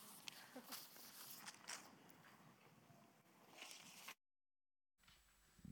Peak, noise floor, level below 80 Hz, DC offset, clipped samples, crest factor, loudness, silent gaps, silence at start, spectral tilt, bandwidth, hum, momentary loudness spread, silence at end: -32 dBFS; under -90 dBFS; -88 dBFS; under 0.1%; under 0.1%; 30 dB; -57 LUFS; none; 0 s; -1.5 dB/octave; over 20 kHz; none; 14 LU; 0 s